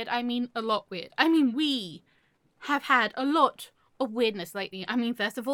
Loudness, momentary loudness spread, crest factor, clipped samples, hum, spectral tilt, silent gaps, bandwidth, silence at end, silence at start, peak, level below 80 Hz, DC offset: -27 LUFS; 12 LU; 22 dB; under 0.1%; none; -4 dB/octave; none; 17.5 kHz; 0 s; 0 s; -6 dBFS; -78 dBFS; under 0.1%